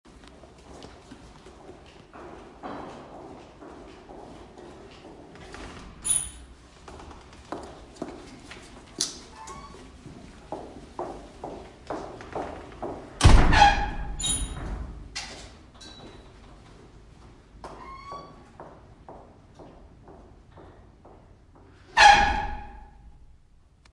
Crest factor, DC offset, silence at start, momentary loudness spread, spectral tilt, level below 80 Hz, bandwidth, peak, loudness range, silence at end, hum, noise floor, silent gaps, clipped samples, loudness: 26 dB; under 0.1%; 0.75 s; 28 LU; -3 dB/octave; -34 dBFS; 11.5 kHz; -4 dBFS; 22 LU; 1.15 s; none; -56 dBFS; none; under 0.1%; -24 LUFS